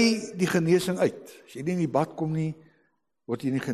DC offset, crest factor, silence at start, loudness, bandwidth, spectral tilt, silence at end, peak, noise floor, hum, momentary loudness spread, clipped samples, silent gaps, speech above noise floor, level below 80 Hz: under 0.1%; 16 dB; 0 s; -27 LUFS; 13 kHz; -6 dB/octave; 0 s; -10 dBFS; -72 dBFS; none; 13 LU; under 0.1%; none; 46 dB; -64 dBFS